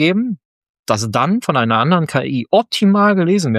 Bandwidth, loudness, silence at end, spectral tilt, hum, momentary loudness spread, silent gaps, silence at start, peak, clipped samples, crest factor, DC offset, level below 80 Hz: 14 kHz; -15 LUFS; 0 s; -6 dB/octave; none; 8 LU; 0.45-0.62 s, 0.69-0.84 s; 0 s; 0 dBFS; under 0.1%; 14 dB; under 0.1%; -60 dBFS